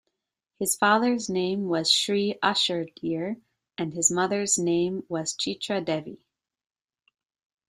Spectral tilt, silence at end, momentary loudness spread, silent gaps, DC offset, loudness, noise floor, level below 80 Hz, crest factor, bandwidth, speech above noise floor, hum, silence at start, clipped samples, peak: -2.5 dB/octave; 1.55 s; 11 LU; none; under 0.1%; -25 LUFS; -82 dBFS; -68 dBFS; 22 dB; 15 kHz; 57 dB; none; 0.6 s; under 0.1%; -6 dBFS